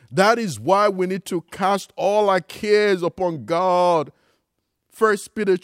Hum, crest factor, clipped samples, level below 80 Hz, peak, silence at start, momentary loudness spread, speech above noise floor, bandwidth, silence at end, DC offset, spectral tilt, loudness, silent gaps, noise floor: none; 18 dB; under 0.1%; -64 dBFS; -2 dBFS; 0.1 s; 7 LU; 56 dB; 16 kHz; 0.05 s; under 0.1%; -5 dB/octave; -20 LUFS; none; -75 dBFS